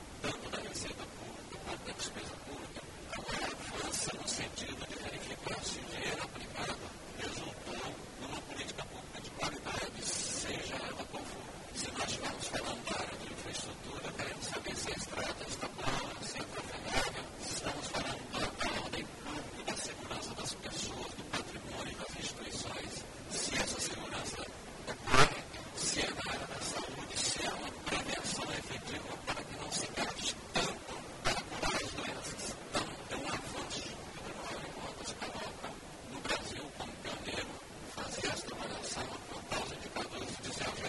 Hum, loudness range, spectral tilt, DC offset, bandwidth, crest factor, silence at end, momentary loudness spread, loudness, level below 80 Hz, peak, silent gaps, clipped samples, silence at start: none; 7 LU; -2.5 dB/octave; under 0.1%; 11.5 kHz; 28 dB; 0 s; 9 LU; -39 LUFS; -54 dBFS; -10 dBFS; none; under 0.1%; 0 s